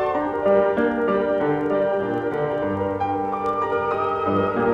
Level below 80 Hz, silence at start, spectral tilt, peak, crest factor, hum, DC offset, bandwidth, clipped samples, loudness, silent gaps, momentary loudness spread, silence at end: -52 dBFS; 0 s; -8.5 dB/octave; -6 dBFS; 16 dB; none; under 0.1%; 7.2 kHz; under 0.1%; -22 LUFS; none; 5 LU; 0 s